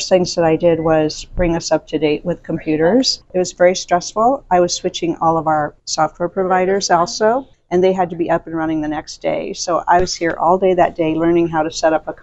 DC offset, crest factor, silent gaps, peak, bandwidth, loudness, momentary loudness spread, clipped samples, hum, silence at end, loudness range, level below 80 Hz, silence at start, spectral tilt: under 0.1%; 16 dB; none; 0 dBFS; 8.2 kHz; -17 LUFS; 7 LU; under 0.1%; none; 0 s; 2 LU; -38 dBFS; 0 s; -4.5 dB/octave